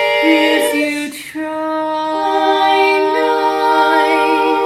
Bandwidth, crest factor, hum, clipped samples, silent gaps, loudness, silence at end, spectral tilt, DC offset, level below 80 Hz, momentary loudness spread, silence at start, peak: 16 kHz; 14 dB; none; under 0.1%; none; -14 LUFS; 0 s; -2.5 dB/octave; under 0.1%; -58 dBFS; 9 LU; 0 s; 0 dBFS